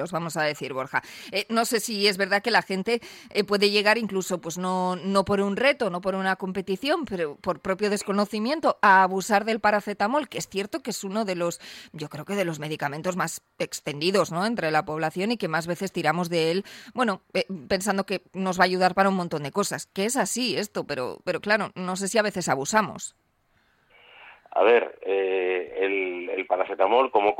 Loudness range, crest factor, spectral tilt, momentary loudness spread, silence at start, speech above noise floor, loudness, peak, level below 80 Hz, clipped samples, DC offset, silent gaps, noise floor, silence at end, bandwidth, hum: 4 LU; 20 dB; -4 dB/octave; 9 LU; 0 s; 42 dB; -25 LUFS; -6 dBFS; -64 dBFS; under 0.1%; under 0.1%; none; -67 dBFS; 0 s; 16.5 kHz; none